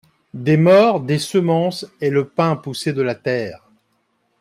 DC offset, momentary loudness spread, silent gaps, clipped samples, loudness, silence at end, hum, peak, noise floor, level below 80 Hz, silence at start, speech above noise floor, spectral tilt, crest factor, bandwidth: under 0.1%; 12 LU; none; under 0.1%; -18 LUFS; 0.85 s; none; -2 dBFS; -66 dBFS; -60 dBFS; 0.35 s; 49 dB; -6.5 dB/octave; 16 dB; 14.5 kHz